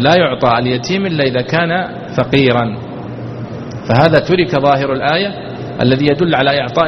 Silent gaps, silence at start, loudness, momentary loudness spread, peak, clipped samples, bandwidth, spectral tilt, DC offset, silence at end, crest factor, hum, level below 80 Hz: none; 0 s; -13 LUFS; 14 LU; 0 dBFS; under 0.1%; 6.4 kHz; -6.5 dB/octave; under 0.1%; 0 s; 14 dB; none; -44 dBFS